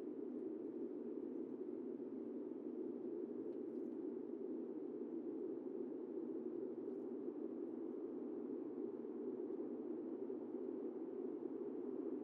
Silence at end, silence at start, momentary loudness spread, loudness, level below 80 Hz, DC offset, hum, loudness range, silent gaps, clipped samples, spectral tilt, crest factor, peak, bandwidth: 0 s; 0 s; 1 LU; -48 LUFS; under -90 dBFS; under 0.1%; none; 1 LU; none; under 0.1%; -9 dB/octave; 12 dB; -34 dBFS; 3.5 kHz